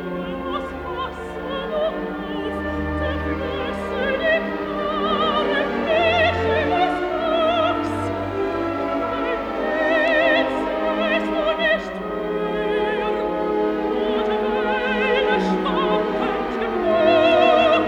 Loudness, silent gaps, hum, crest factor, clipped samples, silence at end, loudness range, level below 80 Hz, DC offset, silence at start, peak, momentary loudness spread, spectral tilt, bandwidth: -21 LUFS; none; none; 16 dB; under 0.1%; 0 s; 4 LU; -44 dBFS; under 0.1%; 0 s; -4 dBFS; 10 LU; -6 dB/octave; 10.5 kHz